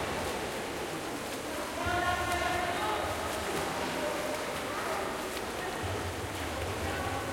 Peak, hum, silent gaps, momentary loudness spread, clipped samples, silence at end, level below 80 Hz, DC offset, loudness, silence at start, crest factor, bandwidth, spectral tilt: -18 dBFS; none; none; 6 LU; under 0.1%; 0 s; -52 dBFS; under 0.1%; -33 LUFS; 0 s; 16 dB; 16.5 kHz; -3.5 dB/octave